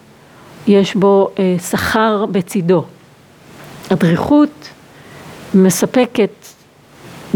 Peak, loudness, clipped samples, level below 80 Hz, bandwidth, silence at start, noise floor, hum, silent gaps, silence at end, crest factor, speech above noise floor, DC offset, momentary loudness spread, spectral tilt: 0 dBFS; -14 LUFS; under 0.1%; -50 dBFS; over 20 kHz; 0.6 s; -44 dBFS; none; none; 0 s; 16 dB; 31 dB; under 0.1%; 11 LU; -6 dB/octave